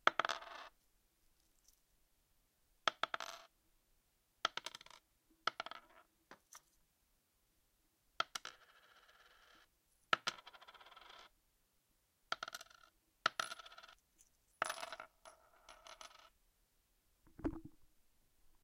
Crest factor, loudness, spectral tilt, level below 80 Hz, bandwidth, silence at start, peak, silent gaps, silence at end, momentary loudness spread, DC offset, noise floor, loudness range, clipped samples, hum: 38 dB; -43 LUFS; -1.5 dB/octave; -72 dBFS; 16.5 kHz; 0.05 s; -12 dBFS; none; 0.8 s; 25 LU; under 0.1%; -79 dBFS; 6 LU; under 0.1%; none